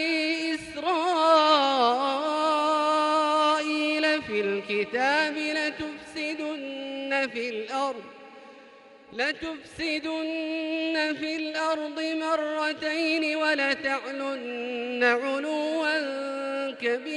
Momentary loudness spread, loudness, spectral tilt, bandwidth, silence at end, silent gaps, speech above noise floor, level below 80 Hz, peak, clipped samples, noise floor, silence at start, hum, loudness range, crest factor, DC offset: 10 LU; -26 LUFS; -3 dB/octave; 11.5 kHz; 0 s; none; 23 dB; -68 dBFS; -8 dBFS; under 0.1%; -51 dBFS; 0 s; none; 9 LU; 20 dB; under 0.1%